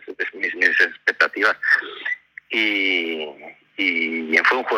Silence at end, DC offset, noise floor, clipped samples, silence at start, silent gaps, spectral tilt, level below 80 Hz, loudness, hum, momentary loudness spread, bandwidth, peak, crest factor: 0 s; under 0.1%; -42 dBFS; under 0.1%; 0.05 s; none; -2 dB/octave; -74 dBFS; -19 LUFS; none; 11 LU; 14.5 kHz; -4 dBFS; 18 dB